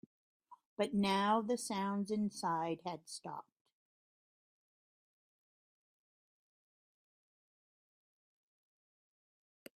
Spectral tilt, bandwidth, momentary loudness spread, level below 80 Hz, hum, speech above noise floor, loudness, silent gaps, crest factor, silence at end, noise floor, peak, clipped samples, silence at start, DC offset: -5 dB/octave; 15 kHz; 14 LU; -82 dBFS; none; over 53 dB; -37 LUFS; 0.66-0.76 s; 22 dB; 6.35 s; under -90 dBFS; -20 dBFS; under 0.1%; 0.5 s; under 0.1%